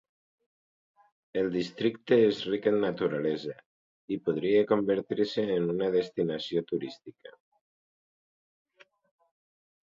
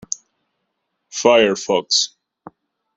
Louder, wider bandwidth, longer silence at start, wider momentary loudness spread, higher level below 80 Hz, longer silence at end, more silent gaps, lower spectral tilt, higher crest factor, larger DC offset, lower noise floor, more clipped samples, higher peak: second, -29 LUFS vs -16 LUFS; second, 7.6 kHz vs 8.4 kHz; first, 1.35 s vs 1.15 s; second, 12 LU vs 15 LU; second, -70 dBFS vs -62 dBFS; first, 2.6 s vs 0.9 s; first, 3.66-4.08 s vs none; first, -7 dB/octave vs -2 dB/octave; about the same, 20 dB vs 20 dB; neither; first, under -90 dBFS vs -74 dBFS; neither; second, -10 dBFS vs -2 dBFS